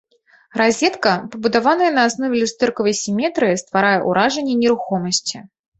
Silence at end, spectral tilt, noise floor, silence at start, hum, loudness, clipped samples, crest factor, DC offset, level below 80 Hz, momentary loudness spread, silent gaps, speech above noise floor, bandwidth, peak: 0.35 s; -3.5 dB/octave; -53 dBFS; 0.55 s; none; -18 LUFS; under 0.1%; 18 dB; under 0.1%; -58 dBFS; 5 LU; none; 36 dB; 8.4 kHz; 0 dBFS